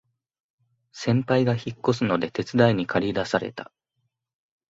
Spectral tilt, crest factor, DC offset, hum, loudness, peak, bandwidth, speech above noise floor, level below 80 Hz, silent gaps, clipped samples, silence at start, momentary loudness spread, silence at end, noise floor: -6.5 dB/octave; 22 dB; under 0.1%; none; -24 LUFS; -4 dBFS; 8 kHz; 54 dB; -58 dBFS; none; under 0.1%; 0.95 s; 8 LU; 1.05 s; -77 dBFS